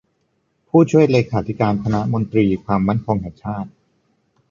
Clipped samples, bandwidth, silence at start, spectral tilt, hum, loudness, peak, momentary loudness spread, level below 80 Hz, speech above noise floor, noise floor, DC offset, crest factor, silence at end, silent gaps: under 0.1%; 7.6 kHz; 0.75 s; -8.5 dB/octave; none; -18 LUFS; -2 dBFS; 14 LU; -46 dBFS; 50 dB; -67 dBFS; under 0.1%; 16 dB; 0.8 s; none